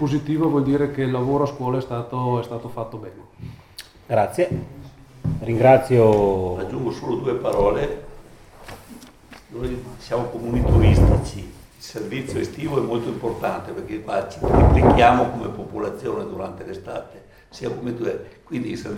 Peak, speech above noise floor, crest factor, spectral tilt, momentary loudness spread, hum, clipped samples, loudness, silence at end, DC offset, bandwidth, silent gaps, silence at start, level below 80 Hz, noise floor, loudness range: 0 dBFS; 24 dB; 20 dB; -7.5 dB/octave; 21 LU; none; under 0.1%; -21 LUFS; 0 s; under 0.1%; 15.5 kHz; none; 0 s; -30 dBFS; -45 dBFS; 8 LU